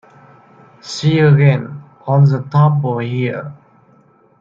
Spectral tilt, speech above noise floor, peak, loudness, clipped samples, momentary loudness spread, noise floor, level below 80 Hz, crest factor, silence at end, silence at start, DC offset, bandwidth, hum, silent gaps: -7.5 dB/octave; 38 dB; -2 dBFS; -14 LUFS; under 0.1%; 19 LU; -51 dBFS; -56 dBFS; 14 dB; 0.85 s; 0.85 s; under 0.1%; 7.6 kHz; none; none